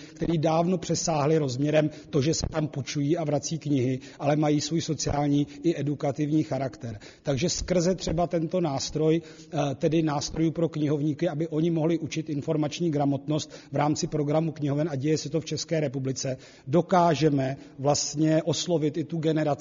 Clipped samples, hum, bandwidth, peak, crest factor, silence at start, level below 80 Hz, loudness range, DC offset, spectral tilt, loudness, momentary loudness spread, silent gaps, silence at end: under 0.1%; none; 7.4 kHz; -10 dBFS; 16 dB; 0 s; -50 dBFS; 2 LU; under 0.1%; -6.5 dB/octave; -27 LUFS; 6 LU; none; 0 s